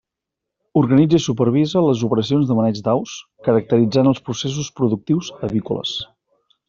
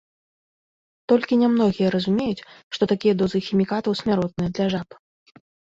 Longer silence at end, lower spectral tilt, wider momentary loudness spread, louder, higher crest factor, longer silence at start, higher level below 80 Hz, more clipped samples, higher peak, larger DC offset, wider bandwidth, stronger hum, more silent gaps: second, 0.65 s vs 0.95 s; about the same, -6.5 dB/octave vs -7 dB/octave; about the same, 9 LU vs 10 LU; first, -18 LUFS vs -22 LUFS; about the same, 16 dB vs 18 dB; second, 0.75 s vs 1.1 s; about the same, -54 dBFS vs -56 dBFS; neither; first, -2 dBFS vs -6 dBFS; neither; about the same, 7.6 kHz vs 7.8 kHz; neither; second, none vs 2.63-2.71 s